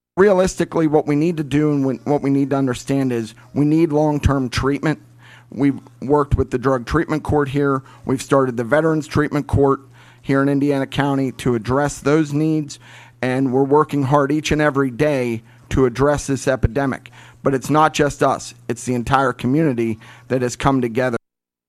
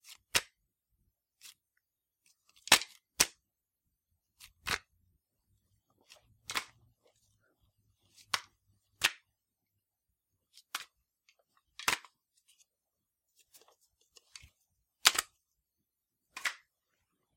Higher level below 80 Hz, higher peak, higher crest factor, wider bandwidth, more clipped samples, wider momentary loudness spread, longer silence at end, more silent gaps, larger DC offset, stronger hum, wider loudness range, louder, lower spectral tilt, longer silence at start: first, -38 dBFS vs -70 dBFS; about the same, -2 dBFS vs 0 dBFS; second, 16 dB vs 40 dB; second, 14 kHz vs 16.5 kHz; neither; second, 8 LU vs 28 LU; second, 0.5 s vs 0.8 s; neither; neither; neither; second, 2 LU vs 10 LU; first, -19 LUFS vs -32 LUFS; first, -6.5 dB/octave vs 1 dB/octave; about the same, 0.15 s vs 0.1 s